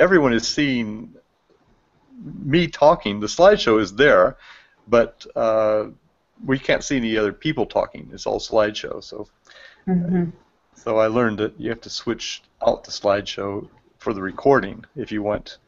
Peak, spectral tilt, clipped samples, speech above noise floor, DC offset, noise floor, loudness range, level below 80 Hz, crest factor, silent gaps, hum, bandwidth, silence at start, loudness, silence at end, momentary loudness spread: -2 dBFS; -5 dB/octave; under 0.1%; 41 dB; under 0.1%; -61 dBFS; 6 LU; -48 dBFS; 20 dB; none; none; 7.8 kHz; 0 s; -20 LUFS; 0.15 s; 17 LU